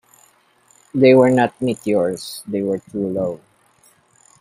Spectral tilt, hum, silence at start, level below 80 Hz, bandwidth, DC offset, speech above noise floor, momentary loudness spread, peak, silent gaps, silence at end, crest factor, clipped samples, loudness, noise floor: -6.5 dB/octave; none; 0.95 s; -60 dBFS; 15.5 kHz; under 0.1%; 39 dB; 15 LU; -2 dBFS; none; 1.05 s; 18 dB; under 0.1%; -18 LUFS; -56 dBFS